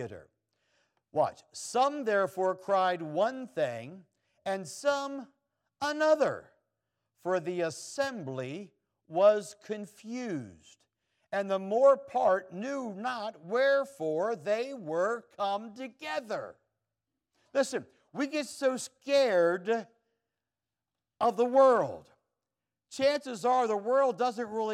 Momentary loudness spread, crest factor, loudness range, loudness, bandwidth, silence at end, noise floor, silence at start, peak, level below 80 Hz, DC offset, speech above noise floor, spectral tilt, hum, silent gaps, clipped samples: 15 LU; 20 dB; 6 LU; -30 LUFS; 13.5 kHz; 0 s; under -90 dBFS; 0 s; -12 dBFS; -82 dBFS; under 0.1%; over 60 dB; -4.5 dB/octave; none; none; under 0.1%